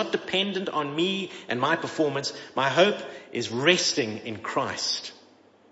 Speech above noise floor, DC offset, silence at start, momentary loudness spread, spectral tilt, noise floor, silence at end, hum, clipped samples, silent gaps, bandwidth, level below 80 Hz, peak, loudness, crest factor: 30 dB; under 0.1%; 0 s; 10 LU; -3.5 dB/octave; -56 dBFS; 0.6 s; none; under 0.1%; none; 8 kHz; -74 dBFS; -4 dBFS; -26 LUFS; 24 dB